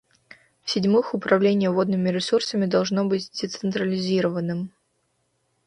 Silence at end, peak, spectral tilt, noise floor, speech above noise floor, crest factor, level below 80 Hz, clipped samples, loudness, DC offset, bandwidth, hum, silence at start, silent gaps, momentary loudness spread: 1 s; -4 dBFS; -6 dB/octave; -71 dBFS; 49 dB; 20 dB; -66 dBFS; under 0.1%; -23 LUFS; under 0.1%; 10.5 kHz; none; 0.65 s; none; 9 LU